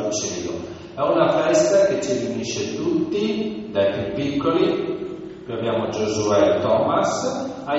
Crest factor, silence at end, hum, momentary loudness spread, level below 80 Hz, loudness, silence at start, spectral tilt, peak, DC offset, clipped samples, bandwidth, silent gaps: 16 dB; 0 s; none; 11 LU; -54 dBFS; -21 LUFS; 0 s; -4.5 dB/octave; -4 dBFS; under 0.1%; under 0.1%; 8 kHz; none